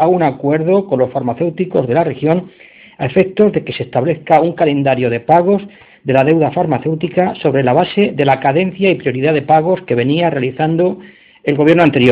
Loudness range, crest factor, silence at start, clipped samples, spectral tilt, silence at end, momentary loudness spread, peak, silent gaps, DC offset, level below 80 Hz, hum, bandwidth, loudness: 2 LU; 14 dB; 0 s; under 0.1%; -9 dB/octave; 0 s; 6 LU; 0 dBFS; none; under 0.1%; -52 dBFS; none; 5.2 kHz; -14 LUFS